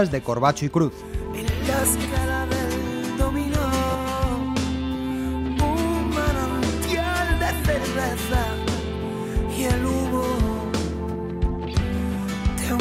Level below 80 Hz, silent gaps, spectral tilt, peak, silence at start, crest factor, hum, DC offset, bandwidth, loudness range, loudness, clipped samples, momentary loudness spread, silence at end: -30 dBFS; none; -5 dB/octave; -6 dBFS; 0 s; 18 dB; none; under 0.1%; 16 kHz; 2 LU; -24 LUFS; under 0.1%; 5 LU; 0 s